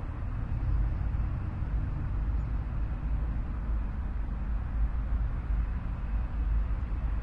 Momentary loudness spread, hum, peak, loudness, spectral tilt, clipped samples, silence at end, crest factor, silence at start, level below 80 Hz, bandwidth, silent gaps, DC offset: 4 LU; none; -18 dBFS; -34 LUFS; -9.5 dB/octave; under 0.1%; 0 s; 12 dB; 0 s; -30 dBFS; 3.5 kHz; none; under 0.1%